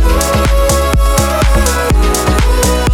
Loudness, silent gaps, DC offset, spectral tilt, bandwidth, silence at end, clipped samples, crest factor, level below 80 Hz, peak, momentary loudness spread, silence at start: -12 LUFS; none; under 0.1%; -4.5 dB/octave; 17 kHz; 0 s; under 0.1%; 10 dB; -12 dBFS; 0 dBFS; 1 LU; 0 s